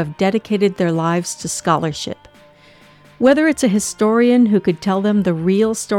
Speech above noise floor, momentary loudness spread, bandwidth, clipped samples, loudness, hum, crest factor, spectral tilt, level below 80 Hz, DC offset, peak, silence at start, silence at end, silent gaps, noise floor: 31 dB; 9 LU; 16 kHz; under 0.1%; -16 LUFS; none; 14 dB; -5.5 dB/octave; -52 dBFS; under 0.1%; -2 dBFS; 0 s; 0 s; none; -47 dBFS